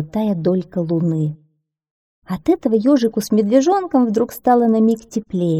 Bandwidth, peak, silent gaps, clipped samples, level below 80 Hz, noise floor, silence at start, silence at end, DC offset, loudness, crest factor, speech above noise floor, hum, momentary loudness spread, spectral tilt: 15.5 kHz; -2 dBFS; 1.91-2.22 s; under 0.1%; -54 dBFS; -62 dBFS; 0 s; 0 s; under 0.1%; -17 LUFS; 14 dB; 45 dB; none; 8 LU; -7.5 dB/octave